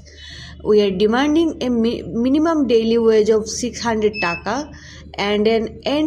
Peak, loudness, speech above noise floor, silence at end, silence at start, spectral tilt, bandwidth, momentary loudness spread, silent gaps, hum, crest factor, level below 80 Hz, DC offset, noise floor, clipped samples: -4 dBFS; -18 LUFS; 20 dB; 0 s; 0.1 s; -5 dB/octave; 10.5 kHz; 15 LU; none; none; 14 dB; -42 dBFS; under 0.1%; -37 dBFS; under 0.1%